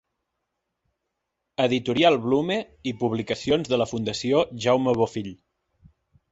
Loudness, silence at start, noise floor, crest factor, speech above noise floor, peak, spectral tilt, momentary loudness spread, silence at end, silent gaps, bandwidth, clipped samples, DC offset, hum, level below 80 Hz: -24 LUFS; 1.6 s; -81 dBFS; 20 dB; 57 dB; -6 dBFS; -5.5 dB/octave; 8 LU; 1 s; none; 8 kHz; under 0.1%; under 0.1%; none; -58 dBFS